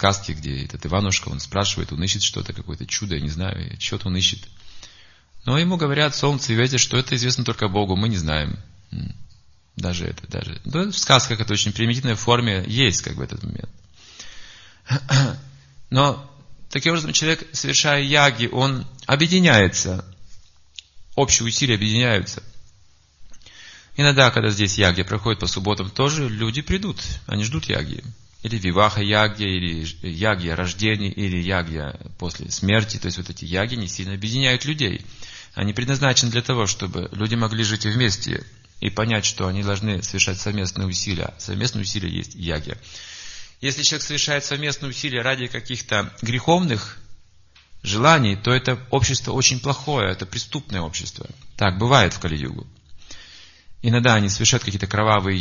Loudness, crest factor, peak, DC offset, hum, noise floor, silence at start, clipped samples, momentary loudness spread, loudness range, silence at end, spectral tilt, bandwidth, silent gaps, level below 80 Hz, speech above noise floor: -21 LUFS; 22 dB; 0 dBFS; under 0.1%; none; -53 dBFS; 0 s; under 0.1%; 15 LU; 5 LU; 0 s; -4 dB/octave; 7.4 kHz; none; -42 dBFS; 32 dB